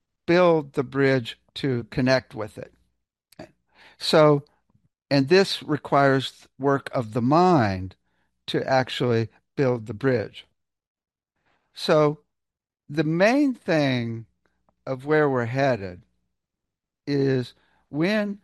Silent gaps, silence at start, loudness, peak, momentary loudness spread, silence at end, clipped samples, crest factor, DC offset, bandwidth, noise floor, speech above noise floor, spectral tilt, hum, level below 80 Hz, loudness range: 10.87-10.95 s; 0.3 s; -23 LUFS; -4 dBFS; 16 LU; 0.1 s; under 0.1%; 20 dB; under 0.1%; 12.5 kHz; -86 dBFS; 64 dB; -6.5 dB/octave; none; -62 dBFS; 5 LU